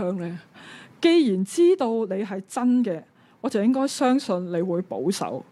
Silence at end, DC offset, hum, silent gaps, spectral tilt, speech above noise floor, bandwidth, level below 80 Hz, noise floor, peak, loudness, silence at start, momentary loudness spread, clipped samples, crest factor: 0.1 s; under 0.1%; none; none; -5.5 dB/octave; 23 dB; 13 kHz; -76 dBFS; -45 dBFS; -8 dBFS; -23 LUFS; 0 s; 14 LU; under 0.1%; 16 dB